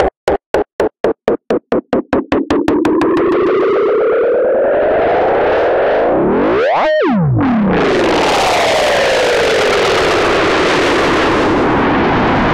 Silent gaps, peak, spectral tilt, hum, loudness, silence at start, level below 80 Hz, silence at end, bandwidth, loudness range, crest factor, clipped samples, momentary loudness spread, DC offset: 0.17-0.27 s, 0.46-0.54 s, 0.73-0.79 s, 1.00-1.04 s; -2 dBFS; -5 dB/octave; none; -12 LUFS; 0 s; -34 dBFS; 0 s; 15.5 kHz; 2 LU; 10 dB; under 0.1%; 5 LU; under 0.1%